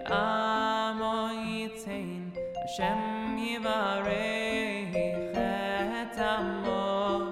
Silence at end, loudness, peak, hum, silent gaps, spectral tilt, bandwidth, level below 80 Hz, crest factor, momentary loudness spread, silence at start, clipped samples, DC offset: 0 s; -31 LUFS; -14 dBFS; none; none; -5 dB/octave; 14.5 kHz; -56 dBFS; 16 dB; 8 LU; 0 s; under 0.1%; under 0.1%